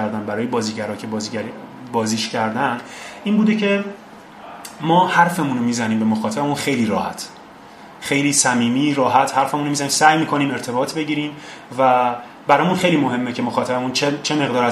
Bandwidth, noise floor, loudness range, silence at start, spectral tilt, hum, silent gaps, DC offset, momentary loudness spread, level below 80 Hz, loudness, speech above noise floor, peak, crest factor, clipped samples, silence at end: 15 kHz; -40 dBFS; 4 LU; 0 s; -4 dB/octave; none; none; under 0.1%; 14 LU; -60 dBFS; -19 LUFS; 22 dB; 0 dBFS; 20 dB; under 0.1%; 0 s